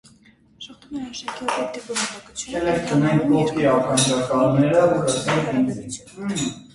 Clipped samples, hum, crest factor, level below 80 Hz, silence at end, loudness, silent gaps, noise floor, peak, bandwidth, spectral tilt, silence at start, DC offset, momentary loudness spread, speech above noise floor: under 0.1%; none; 18 dB; -52 dBFS; 0.1 s; -21 LUFS; none; -53 dBFS; -4 dBFS; 11.5 kHz; -5 dB/octave; 0.6 s; under 0.1%; 15 LU; 32 dB